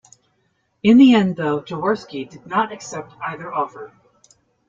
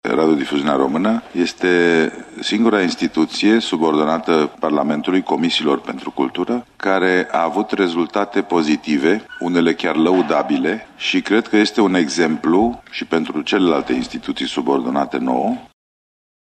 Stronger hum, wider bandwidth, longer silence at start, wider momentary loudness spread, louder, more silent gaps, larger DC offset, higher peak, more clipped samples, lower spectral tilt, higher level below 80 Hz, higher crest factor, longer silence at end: neither; second, 7.6 kHz vs 9.2 kHz; first, 0.85 s vs 0.05 s; first, 20 LU vs 7 LU; about the same, -18 LUFS vs -18 LUFS; neither; neither; about the same, -2 dBFS vs -4 dBFS; neither; about the same, -6 dB/octave vs -5 dB/octave; second, -60 dBFS vs -54 dBFS; about the same, 18 dB vs 14 dB; about the same, 0.8 s vs 0.8 s